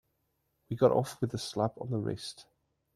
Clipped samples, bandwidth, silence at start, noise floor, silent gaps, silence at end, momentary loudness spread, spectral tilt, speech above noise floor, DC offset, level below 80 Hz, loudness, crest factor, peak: under 0.1%; 13.5 kHz; 0.7 s; -78 dBFS; none; 0.55 s; 15 LU; -6.5 dB/octave; 47 dB; under 0.1%; -66 dBFS; -32 LUFS; 22 dB; -10 dBFS